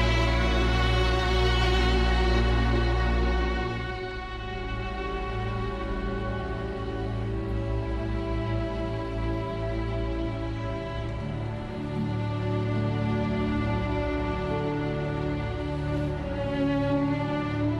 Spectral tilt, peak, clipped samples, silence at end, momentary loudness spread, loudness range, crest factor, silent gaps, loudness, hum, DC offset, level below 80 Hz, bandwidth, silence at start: -7 dB/octave; -12 dBFS; under 0.1%; 0 s; 8 LU; 7 LU; 16 dB; none; -28 LUFS; none; under 0.1%; -32 dBFS; 9.4 kHz; 0 s